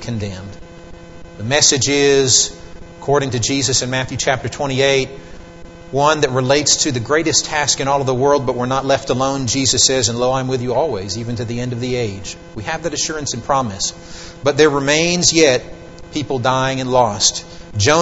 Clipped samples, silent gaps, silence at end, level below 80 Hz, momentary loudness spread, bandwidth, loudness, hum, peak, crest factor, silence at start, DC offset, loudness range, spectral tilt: under 0.1%; none; 0 s; -42 dBFS; 14 LU; 8.2 kHz; -16 LUFS; none; 0 dBFS; 18 dB; 0 s; 0.6%; 6 LU; -3 dB/octave